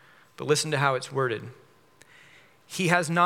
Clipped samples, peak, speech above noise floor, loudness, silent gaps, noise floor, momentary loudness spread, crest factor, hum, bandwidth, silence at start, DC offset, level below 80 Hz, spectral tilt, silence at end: under 0.1%; -4 dBFS; 32 dB; -26 LUFS; none; -58 dBFS; 15 LU; 24 dB; none; 16.5 kHz; 0.4 s; under 0.1%; -78 dBFS; -4 dB/octave; 0 s